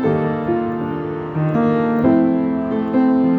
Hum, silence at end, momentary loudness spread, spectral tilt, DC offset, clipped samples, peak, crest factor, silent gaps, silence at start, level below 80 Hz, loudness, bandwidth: none; 0 s; 8 LU; -10.5 dB/octave; under 0.1%; under 0.1%; -4 dBFS; 14 dB; none; 0 s; -50 dBFS; -18 LUFS; 4.6 kHz